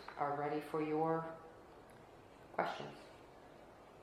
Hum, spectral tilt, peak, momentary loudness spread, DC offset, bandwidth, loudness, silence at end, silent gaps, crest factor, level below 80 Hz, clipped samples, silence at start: none; -7 dB/octave; -20 dBFS; 22 LU; under 0.1%; 15 kHz; -41 LUFS; 0 s; none; 24 dB; -74 dBFS; under 0.1%; 0 s